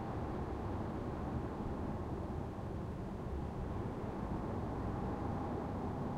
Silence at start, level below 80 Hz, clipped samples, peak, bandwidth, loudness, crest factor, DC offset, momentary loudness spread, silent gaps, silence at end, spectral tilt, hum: 0 s; -48 dBFS; under 0.1%; -28 dBFS; 13 kHz; -42 LUFS; 12 dB; under 0.1%; 3 LU; none; 0 s; -8.5 dB/octave; none